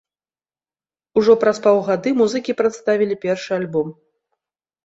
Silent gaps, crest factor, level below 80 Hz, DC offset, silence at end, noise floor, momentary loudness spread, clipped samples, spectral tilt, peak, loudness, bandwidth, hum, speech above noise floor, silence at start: none; 18 dB; -62 dBFS; under 0.1%; 0.95 s; under -90 dBFS; 8 LU; under 0.1%; -5.5 dB/octave; -2 dBFS; -18 LUFS; 8 kHz; none; over 73 dB; 1.15 s